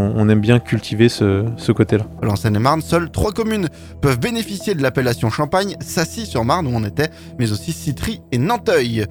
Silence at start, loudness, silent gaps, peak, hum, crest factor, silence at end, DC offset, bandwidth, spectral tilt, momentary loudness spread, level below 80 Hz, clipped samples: 0 s; -18 LUFS; none; 0 dBFS; none; 18 dB; 0 s; under 0.1%; 19 kHz; -6 dB/octave; 7 LU; -40 dBFS; under 0.1%